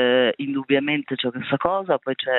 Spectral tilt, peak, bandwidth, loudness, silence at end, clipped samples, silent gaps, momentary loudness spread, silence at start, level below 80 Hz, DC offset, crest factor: -9 dB/octave; -2 dBFS; 4.1 kHz; -22 LUFS; 0 s; under 0.1%; none; 6 LU; 0 s; -62 dBFS; under 0.1%; 18 dB